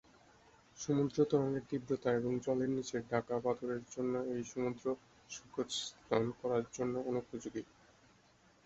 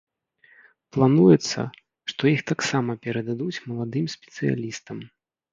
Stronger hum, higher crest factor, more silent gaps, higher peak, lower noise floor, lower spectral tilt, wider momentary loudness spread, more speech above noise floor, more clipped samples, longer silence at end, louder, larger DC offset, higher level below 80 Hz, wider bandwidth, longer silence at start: neither; about the same, 20 dB vs 20 dB; neither; second, -18 dBFS vs -4 dBFS; first, -67 dBFS vs -59 dBFS; about the same, -5.5 dB/octave vs -6 dB/octave; second, 11 LU vs 17 LU; second, 31 dB vs 36 dB; neither; first, 1 s vs 0.45 s; second, -37 LUFS vs -23 LUFS; neither; second, -70 dBFS vs -62 dBFS; second, 7.6 kHz vs 9 kHz; second, 0.75 s vs 0.95 s